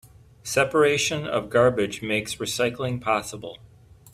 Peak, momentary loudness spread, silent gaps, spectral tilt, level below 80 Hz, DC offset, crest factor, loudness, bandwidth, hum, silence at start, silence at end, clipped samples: -6 dBFS; 14 LU; none; -4 dB/octave; -56 dBFS; under 0.1%; 18 dB; -23 LUFS; 16 kHz; none; 0.45 s; 0.05 s; under 0.1%